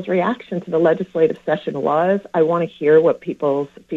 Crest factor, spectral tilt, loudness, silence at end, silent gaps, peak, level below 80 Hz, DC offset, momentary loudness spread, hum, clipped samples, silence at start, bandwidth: 16 dB; -8.5 dB/octave; -18 LUFS; 0 s; none; -2 dBFS; -64 dBFS; under 0.1%; 8 LU; none; under 0.1%; 0 s; 7 kHz